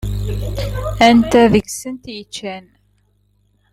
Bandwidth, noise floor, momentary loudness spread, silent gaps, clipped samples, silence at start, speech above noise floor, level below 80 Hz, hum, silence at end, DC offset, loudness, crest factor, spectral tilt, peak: 15.5 kHz; -59 dBFS; 19 LU; none; under 0.1%; 0 s; 44 dB; -30 dBFS; 50 Hz at -35 dBFS; 1.15 s; under 0.1%; -15 LUFS; 18 dB; -5.5 dB/octave; 0 dBFS